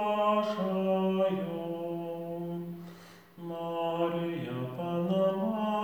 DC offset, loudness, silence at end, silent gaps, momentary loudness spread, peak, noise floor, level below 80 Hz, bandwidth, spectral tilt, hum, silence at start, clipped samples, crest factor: under 0.1%; -32 LUFS; 0 s; none; 13 LU; -18 dBFS; -52 dBFS; -74 dBFS; over 20 kHz; -8 dB/octave; none; 0 s; under 0.1%; 14 dB